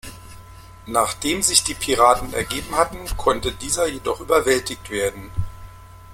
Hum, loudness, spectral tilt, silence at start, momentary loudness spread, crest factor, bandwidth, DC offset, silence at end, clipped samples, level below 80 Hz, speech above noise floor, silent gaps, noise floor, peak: none; -20 LUFS; -2.5 dB/octave; 0.05 s; 12 LU; 22 dB; 16.5 kHz; under 0.1%; 0 s; under 0.1%; -38 dBFS; 21 dB; none; -42 dBFS; 0 dBFS